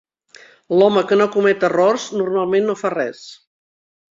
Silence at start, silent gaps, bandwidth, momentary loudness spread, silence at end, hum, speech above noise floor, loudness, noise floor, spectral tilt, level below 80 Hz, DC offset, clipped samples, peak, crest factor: 0.7 s; none; 7.8 kHz; 8 LU; 0.8 s; none; 31 dB; -17 LUFS; -47 dBFS; -5.5 dB/octave; -64 dBFS; under 0.1%; under 0.1%; -2 dBFS; 16 dB